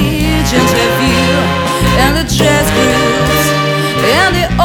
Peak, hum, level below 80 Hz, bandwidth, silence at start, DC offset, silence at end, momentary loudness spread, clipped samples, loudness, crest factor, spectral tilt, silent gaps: 0 dBFS; none; -22 dBFS; 18.5 kHz; 0 s; under 0.1%; 0 s; 3 LU; under 0.1%; -10 LUFS; 10 dB; -4.5 dB/octave; none